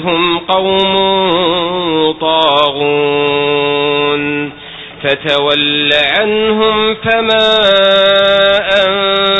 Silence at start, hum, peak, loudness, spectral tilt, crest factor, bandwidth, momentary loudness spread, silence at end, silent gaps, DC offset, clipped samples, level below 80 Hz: 0 s; none; 0 dBFS; -10 LUFS; -5.5 dB/octave; 12 dB; 8 kHz; 6 LU; 0 s; none; under 0.1%; 0.2%; -44 dBFS